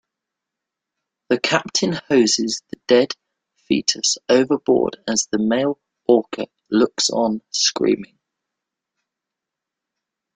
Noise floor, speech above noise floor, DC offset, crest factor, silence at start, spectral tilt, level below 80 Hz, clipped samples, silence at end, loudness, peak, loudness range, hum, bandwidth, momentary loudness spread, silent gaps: -84 dBFS; 66 dB; under 0.1%; 20 dB; 1.3 s; -3 dB/octave; -62 dBFS; under 0.1%; 2.3 s; -19 LUFS; -2 dBFS; 3 LU; none; 9.6 kHz; 8 LU; none